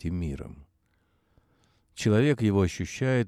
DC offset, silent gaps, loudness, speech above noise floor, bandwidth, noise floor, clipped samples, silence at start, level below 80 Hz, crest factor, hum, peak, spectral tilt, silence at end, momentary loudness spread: under 0.1%; none; -26 LUFS; 44 dB; 13.5 kHz; -70 dBFS; under 0.1%; 0.05 s; -48 dBFS; 18 dB; none; -10 dBFS; -6.5 dB/octave; 0 s; 18 LU